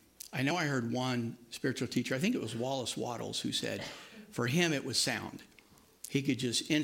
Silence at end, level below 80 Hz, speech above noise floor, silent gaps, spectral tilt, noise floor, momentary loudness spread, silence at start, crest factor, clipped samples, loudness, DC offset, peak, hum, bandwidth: 0 s; -72 dBFS; 28 dB; none; -4 dB/octave; -62 dBFS; 11 LU; 0.25 s; 20 dB; under 0.1%; -34 LUFS; under 0.1%; -14 dBFS; none; 16.5 kHz